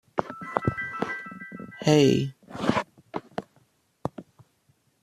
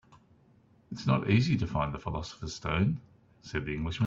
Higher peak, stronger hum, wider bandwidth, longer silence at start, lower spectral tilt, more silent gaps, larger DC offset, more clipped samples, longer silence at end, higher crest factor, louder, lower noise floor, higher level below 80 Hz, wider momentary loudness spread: first, -4 dBFS vs -12 dBFS; neither; first, 14 kHz vs 7.8 kHz; about the same, 0.15 s vs 0.1 s; about the same, -6 dB/octave vs -6.5 dB/octave; neither; neither; neither; first, 0.8 s vs 0 s; first, 26 dB vs 20 dB; first, -27 LUFS vs -31 LUFS; first, -67 dBFS vs -63 dBFS; second, -58 dBFS vs -50 dBFS; first, 19 LU vs 13 LU